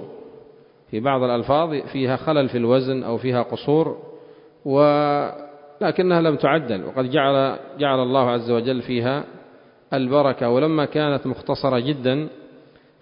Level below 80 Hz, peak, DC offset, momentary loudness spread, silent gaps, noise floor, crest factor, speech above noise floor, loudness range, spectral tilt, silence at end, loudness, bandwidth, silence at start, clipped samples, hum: -58 dBFS; -2 dBFS; under 0.1%; 8 LU; none; -50 dBFS; 18 dB; 30 dB; 2 LU; -11.5 dB/octave; 0.55 s; -21 LUFS; 5.4 kHz; 0 s; under 0.1%; none